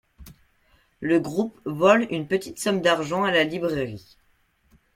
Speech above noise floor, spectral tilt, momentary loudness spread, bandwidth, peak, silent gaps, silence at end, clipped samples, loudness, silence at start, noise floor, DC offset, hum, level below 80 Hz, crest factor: 42 dB; -5 dB/octave; 11 LU; 16.5 kHz; -4 dBFS; none; 0.95 s; under 0.1%; -23 LUFS; 0.2 s; -65 dBFS; under 0.1%; none; -58 dBFS; 22 dB